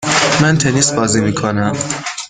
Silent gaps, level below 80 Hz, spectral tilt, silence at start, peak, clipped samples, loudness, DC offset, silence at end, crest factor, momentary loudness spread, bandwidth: none; -44 dBFS; -4 dB/octave; 0 s; 0 dBFS; under 0.1%; -14 LUFS; under 0.1%; 0 s; 14 dB; 6 LU; 9.8 kHz